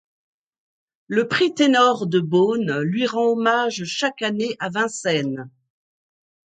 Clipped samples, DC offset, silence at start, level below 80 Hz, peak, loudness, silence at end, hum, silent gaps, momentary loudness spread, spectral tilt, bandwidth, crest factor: under 0.1%; under 0.1%; 1.1 s; -70 dBFS; -4 dBFS; -20 LUFS; 1.05 s; none; none; 7 LU; -4.5 dB/octave; 9.4 kHz; 18 dB